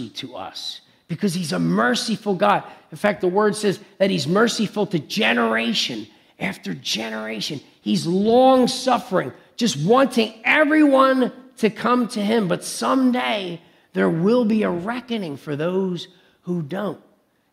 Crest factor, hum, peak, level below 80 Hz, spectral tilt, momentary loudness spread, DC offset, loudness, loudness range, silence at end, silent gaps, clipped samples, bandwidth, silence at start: 18 dB; none; -2 dBFS; -66 dBFS; -5 dB/octave; 15 LU; under 0.1%; -20 LUFS; 5 LU; 0.55 s; none; under 0.1%; 15.5 kHz; 0 s